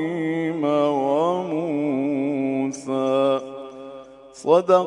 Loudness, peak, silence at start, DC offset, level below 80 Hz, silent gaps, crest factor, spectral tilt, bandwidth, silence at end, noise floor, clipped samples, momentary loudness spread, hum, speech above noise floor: -22 LUFS; -4 dBFS; 0 s; under 0.1%; -70 dBFS; none; 18 dB; -6.5 dB/octave; 11 kHz; 0 s; -42 dBFS; under 0.1%; 17 LU; none; 23 dB